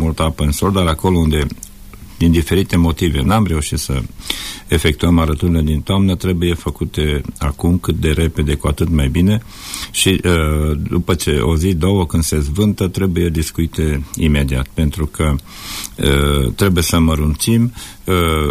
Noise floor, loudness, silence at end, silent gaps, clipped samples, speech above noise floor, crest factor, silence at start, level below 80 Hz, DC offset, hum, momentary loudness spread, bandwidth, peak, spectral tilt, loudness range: -35 dBFS; -16 LUFS; 0 s; none; under 0.1%; 20 dB; 12 dB; 0 s; -24 dBFS; under 0.1%; none; 7 LU; 15.5 kHz; -2 dBFS; -5.5 dB/octave; 2 LU